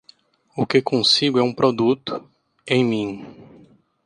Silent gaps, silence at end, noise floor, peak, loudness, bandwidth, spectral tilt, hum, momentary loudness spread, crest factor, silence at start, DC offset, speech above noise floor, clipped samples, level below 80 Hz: none; 0.65 s; -54 dBFS; -4 dBFS; -19 LUFS; 10.5 kHz; -5 dB/octave; none; 16 LU; 18 dB; 0.55 s; under 0.1%; 35 dB; under 0.1%; -62 dBFS